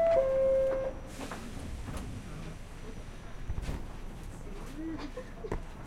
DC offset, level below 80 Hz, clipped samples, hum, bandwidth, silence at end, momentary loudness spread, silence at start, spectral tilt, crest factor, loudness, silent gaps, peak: under 0.1%; -42 dBFS; under 0.1%; none; 14 kHz; 0 s; 19 LU; 0 s; -6.5 dB/octave; 18 dB; -35 LUFS; none; -16 dBFS